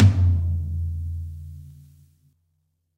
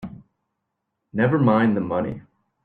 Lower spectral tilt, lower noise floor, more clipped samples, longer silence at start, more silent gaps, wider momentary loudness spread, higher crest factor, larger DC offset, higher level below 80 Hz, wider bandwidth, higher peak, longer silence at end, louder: second, -8.5 dB/octave vs -10.5 dB/octave; second, -72 dBFS vs -79 dBFS; neither; about the same, 0 s vs 0 s; neither; first, 22 LU vs 18 LU; about the same, 20 dB vs 18 dB; neither; first, -36 dBFS vs -58 dBFS; first, 6 kHz vs 4.5 kHz; about the same, -4 dBFS vs -6 dBFS; first, 1.25 s vs 0.45 s; second, -25 LUFS vs -21 LUFS